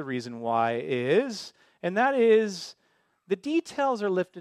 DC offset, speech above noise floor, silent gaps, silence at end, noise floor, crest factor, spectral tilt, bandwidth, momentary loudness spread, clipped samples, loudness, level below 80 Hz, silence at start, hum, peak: under 0.1%; 40 dB; none; 0 s; -66 dBFS; 16 dB; -5.5 dB/octave; 11.5 kHz; 14 LU; under 0.1%; -26 LUFS; -78 dBFS; 0 s; none; -10 dBFS